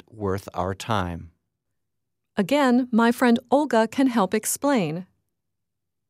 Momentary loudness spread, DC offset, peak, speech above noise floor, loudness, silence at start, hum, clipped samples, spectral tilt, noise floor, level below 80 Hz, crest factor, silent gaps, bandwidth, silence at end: 10 LU; under 0.1%; -6 dBFS; 62 dB; -23 LUFS; 0.15 s; none; under 0.1%; -5 dB/octave; -84 dBFS; -58 dBFS; 18 dB; none; 15.5 kHz; 1.05 s